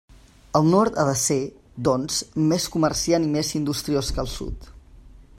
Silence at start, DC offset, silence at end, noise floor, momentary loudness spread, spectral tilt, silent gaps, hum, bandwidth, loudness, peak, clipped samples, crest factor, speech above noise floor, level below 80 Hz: 0.55 s; under 0.1%; 0.15 s; -47 dBFS; 11 LU; -5 dB/octave; none; none; 16 kHz; -22 LUFS; -4 dBFS; under 0.1%; 18 dB; 25 dB; -40 dBFS